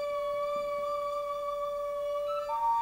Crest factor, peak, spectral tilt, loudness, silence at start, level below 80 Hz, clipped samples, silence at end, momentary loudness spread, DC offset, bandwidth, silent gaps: 10 dB; -22 dBFS; -3 dB/octave; -33 LUFS; 0 s; -62 dBFS; under 0.1%; 0 s; 3 LU; under 0.1%; 16 kHz; none